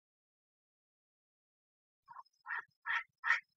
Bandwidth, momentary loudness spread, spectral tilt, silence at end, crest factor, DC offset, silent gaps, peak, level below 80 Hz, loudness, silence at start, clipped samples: 7.6 kHz; 23 LU; 6 dB/octave; 0.15 s; 26 dB; under 0.1%; 2.76-2.82 s, 3.19-3.23 s; -18 dBFS; under -90 dBFS; -38 LUFS; 2.1 s; under 0.1%